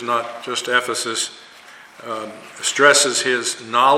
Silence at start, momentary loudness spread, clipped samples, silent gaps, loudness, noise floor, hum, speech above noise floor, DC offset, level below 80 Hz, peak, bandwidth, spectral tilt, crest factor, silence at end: 0 s; 17 LU; under 0.1%; none; -18 LUFS; -43 dBFS; none; 24 dB; under 0.1%; -70 dBFS; 0 dBFS; 16.5 kHz; -0.5 dB/octave; 20 dB; 0 s